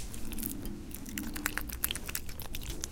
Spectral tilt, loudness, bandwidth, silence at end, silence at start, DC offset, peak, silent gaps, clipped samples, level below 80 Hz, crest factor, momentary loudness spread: -2.5 dB/octave; -38 LUFS; 17 kHz; 0 s; 0 s; under 0.1%; -6 dBFS; none; under 0.1%; -42 dBFS; 30 dB; 8 LU